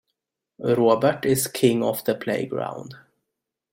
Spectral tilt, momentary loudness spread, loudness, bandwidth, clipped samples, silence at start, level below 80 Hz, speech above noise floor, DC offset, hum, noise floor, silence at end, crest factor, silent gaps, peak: -5 dB/octave; 12 LU; -22 LUFS; 16.5 kHz; under 0.1%; 0.6 s; -62 dBFS; 61 dB; under 0.1%; none; -83 dBFS; 0.75 s; 20 dB; none; -4 dBFS